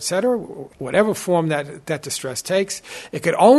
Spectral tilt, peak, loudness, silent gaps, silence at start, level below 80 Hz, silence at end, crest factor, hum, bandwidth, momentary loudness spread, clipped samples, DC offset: -4.5 dB/octave; -2 dBFS; -22 LUFS; none; 0 s; -58 dBFS; 0 s; 18 dB; none; 12.5 kHz; 11 LU; under 0.1%; under 0.1%